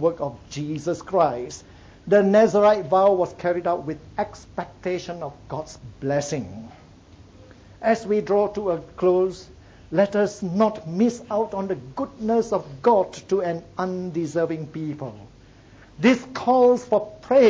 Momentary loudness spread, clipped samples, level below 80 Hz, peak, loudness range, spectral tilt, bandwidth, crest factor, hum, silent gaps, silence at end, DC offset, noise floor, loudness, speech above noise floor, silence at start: 15 LU; under 0.1%; -54 dBFS; -4 dBFS; 9 LU; -6.5 dB/octave; 8 kHz; 18 dB; none; none; 0 s; under 0.1%; -49 dBFS; -23 LUFS; 27 dB; 0 s